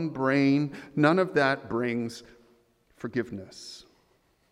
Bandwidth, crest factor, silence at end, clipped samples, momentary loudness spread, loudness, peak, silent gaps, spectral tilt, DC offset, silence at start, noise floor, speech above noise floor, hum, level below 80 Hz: 11.5 kHz; 22 dB; 0.7 s; under 0.1%; 20 LU; -27 LUFS; -6 dBFS; none; -6.5 dB/octave; under 0.1%; 0 s; -67 dBFS; 40 dB; none; -66 dBFS